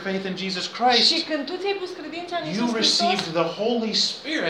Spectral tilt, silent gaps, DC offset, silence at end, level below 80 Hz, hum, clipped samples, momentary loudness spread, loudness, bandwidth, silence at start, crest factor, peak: -3 dB/octave; none; under 0.1%; 0 s; -72 dBFS; none; under 0.1%; 12 LU; -22 LUFS; 13.5 kHz; 0 s; 18 dB; -4 dBFS